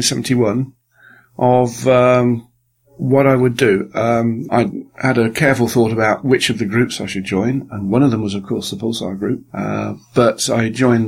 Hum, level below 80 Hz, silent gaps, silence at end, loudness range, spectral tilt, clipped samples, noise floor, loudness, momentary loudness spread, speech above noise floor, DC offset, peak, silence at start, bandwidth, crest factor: none; -50 dBFS; none; 0 s; 4 LU; -5.5 dB/octave; under 0.1%; -55 dBFS; -16 LUFS; 9 LU; 39 dB; under 0.1%; 0 dBFS; 0 s; 16 kHz; 16 dB